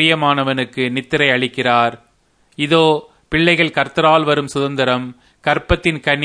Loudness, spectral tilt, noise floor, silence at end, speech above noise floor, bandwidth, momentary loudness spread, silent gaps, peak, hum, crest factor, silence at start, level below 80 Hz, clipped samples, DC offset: -16 LUFS; -5.5 dB/octave; -57 dBFS; 0 s; 42 dB; 10.5 kHz; 8 LU; none; 0 dBFS; none; 16 dB; 0 s; -36 dBFS; under 0.1%; under 0.1%